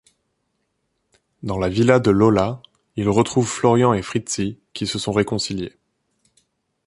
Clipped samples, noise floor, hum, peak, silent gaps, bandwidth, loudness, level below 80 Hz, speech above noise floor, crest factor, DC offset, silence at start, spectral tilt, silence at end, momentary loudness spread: under 0.1%; -72 dBFS; none; -2 dBFS; none; 11.5 kHz; -20 LUFS; -48 dBFS; 54 dB; 20 dB; under 0.1%; 1.45 s; -5.5 dB/octave; 1.15 s; 13 LU